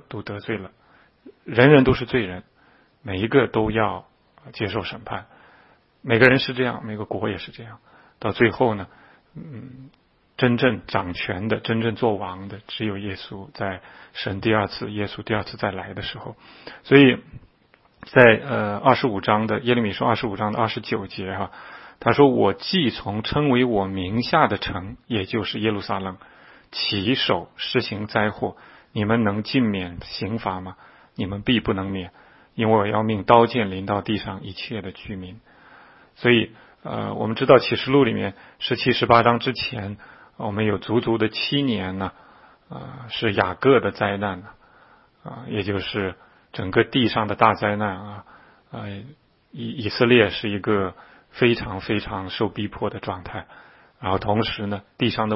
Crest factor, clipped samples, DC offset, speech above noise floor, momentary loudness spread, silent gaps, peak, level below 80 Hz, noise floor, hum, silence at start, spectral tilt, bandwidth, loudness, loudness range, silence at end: 22 dB; under 0.1%; under 0.1%; 36 dB; 20 LU; none; 0 dBFS; -50 dBFS; -58 dBFS; none; 0.1 s; -9 dB/octave; 5.8 kHz; -22 LUFS; 7 LU; 0 s